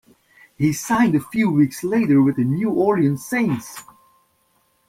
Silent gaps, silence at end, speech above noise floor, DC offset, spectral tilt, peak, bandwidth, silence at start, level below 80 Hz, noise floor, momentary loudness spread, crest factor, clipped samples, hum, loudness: none; 1.05 s; 45 dB; under 0.1%; -6.5 dB/octave; -6 dBFS; 16 kHz; 0.6 s; -56 dBFS; -64 dBFS; 7 LU; 14 dB; under 0.1%; none; -19 LUFS